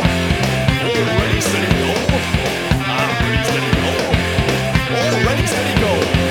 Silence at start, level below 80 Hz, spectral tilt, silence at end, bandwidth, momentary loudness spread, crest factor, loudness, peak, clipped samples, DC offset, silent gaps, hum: 0 s; -28 dBFS; -5 dB/octave; 0 s; 19 kHz; 2 LU; 16 dB; -16 LUFS; 0 dBFS; under 0.1%; under 0.1%; none; none